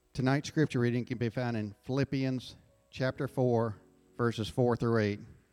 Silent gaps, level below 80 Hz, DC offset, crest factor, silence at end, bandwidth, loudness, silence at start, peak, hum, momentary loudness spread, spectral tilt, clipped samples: none; -60 dBFS; under 0.1%; 16 dB; 0.2 s; 12.5 kHz; -32 LUFS; 0.15 s; -16 dBFS; none; 9 LU; -7 dB/octave; under 0.1%